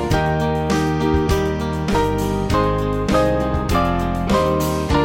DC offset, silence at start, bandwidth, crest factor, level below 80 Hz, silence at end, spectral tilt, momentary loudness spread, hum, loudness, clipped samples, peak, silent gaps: under 0.1%; 0 s; 17 kHz; 14 dB; -28 dBFS; 0 s; -6.5 dB/octave; 3 LU; none; -19 LUFS; under 0.1%; -4 dBFS; none